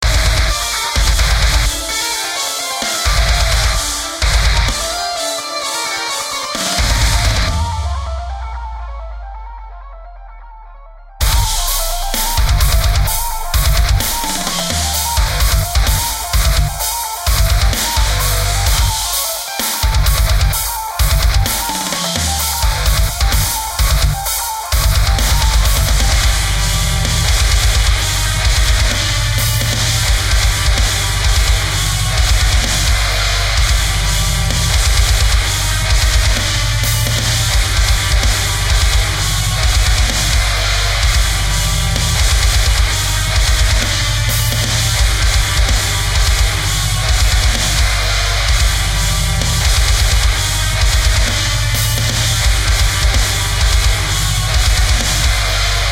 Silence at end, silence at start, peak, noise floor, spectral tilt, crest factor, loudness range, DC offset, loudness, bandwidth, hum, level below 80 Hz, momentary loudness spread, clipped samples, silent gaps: 0 s; 0 s; 0 dBFS; -36 dBFS; -2.5 dB/octave; 14 dB; 3 LU; under 0.1%; -14 LUFS; 16 kHz; none; -16 dBFS; 4 LU; under 0.1%; none